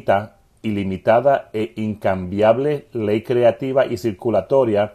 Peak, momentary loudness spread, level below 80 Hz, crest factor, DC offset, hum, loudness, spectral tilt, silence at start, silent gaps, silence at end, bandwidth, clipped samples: -2 dBFS; 8 LU; -48 dBFS; 16 dB; under 0.1%; none; -19 LUFS; -7.5 dB/octave; 0.05 s; none; 0 s; 14 kHz; under 0.1%